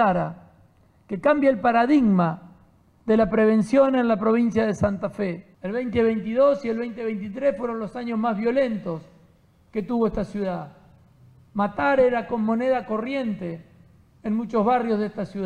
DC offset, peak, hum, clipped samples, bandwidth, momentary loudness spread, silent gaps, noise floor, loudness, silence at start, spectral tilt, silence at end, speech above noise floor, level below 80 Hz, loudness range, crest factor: under 0.1%; -8 dBFS; none; under 0.1%; 10 kHz; 14 LU; none; -57 dBFS; -23 LUFS; 0 s; -8 dB/octave; 0 s; 35 dB; -52 dBFS; 6 LU; 16 dB